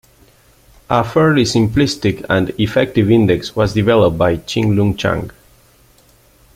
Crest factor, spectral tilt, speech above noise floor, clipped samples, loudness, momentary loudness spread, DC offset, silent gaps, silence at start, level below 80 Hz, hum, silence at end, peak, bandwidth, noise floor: 14 dB; -6.5 dB/octave; 36 dB; under 0.1%; -15 LUFS; 6 LU; under 0.1%; none; 0.9 s; -40 dBFS; none; 1.25 s; 0 dBFS; 16 kHz; -50 dBFS